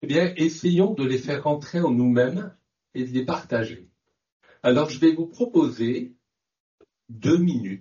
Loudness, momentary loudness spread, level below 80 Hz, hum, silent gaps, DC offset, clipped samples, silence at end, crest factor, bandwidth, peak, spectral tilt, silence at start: -23 LUFS; 11 LU; -64 dBFS; none; 4.32-4.40 s, 6.60-6.78 s; under 0.1%; under 0.1%; 0 s; 16 dB; 7.2 kHz; -8 dBFS; -6.5 dB/octave; 0 s